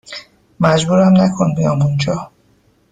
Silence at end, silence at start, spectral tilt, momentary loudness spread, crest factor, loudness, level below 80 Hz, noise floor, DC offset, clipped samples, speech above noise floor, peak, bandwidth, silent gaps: 0.65 s; 0.1 s; -6.5 dB/octave; 13 LU; 14 dB; -14 LUFS; -48 dBFS; -55 dBFS; under 0.1%; under 0.1%; 42 dB; -2 dBFS; 9.2 kHz; none